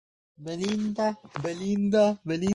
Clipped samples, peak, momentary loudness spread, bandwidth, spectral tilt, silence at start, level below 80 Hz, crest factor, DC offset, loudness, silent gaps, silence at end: under 0.1%; -12 dBFS; 12 LU; 10.5 kHz; -6 dB/octave; 0.4 s; -60 dBFS; 16 dB; under 0.1%; -27 LUFS; none; 0 s